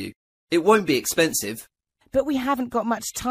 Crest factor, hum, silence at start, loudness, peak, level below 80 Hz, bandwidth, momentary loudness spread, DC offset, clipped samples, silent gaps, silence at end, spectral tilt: 18 dB; none; 0 s; -22 LUFS; -6 dBFS; -54 dBFS; 15.5 kHz; 10 LU; under 0.1%; under 0.1%; 0.16-0.47 s; 0 s; -3.5 dB/octave